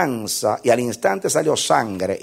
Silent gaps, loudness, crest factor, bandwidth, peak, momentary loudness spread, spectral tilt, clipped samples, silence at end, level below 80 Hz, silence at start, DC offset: none; -19 LUFS; 18 dB; 16 kHz; -2 dBFS; 3 LU; -3.5 dB/octave; under 0.1%; 0 s; -62 dBFS; 0 s; under 0.1%